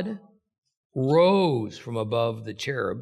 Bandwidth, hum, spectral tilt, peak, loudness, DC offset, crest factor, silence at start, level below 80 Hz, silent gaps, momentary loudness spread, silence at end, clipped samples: 12 kHz; none; -6.5 dB/octave; -8 dBFS; -25 LUFS; under 0.1%; 18 dB; 0 s; -66 dBFS; 0.58-0.62 s, 0.77-0.90 s; 15 LU; 0 s; under 0.1%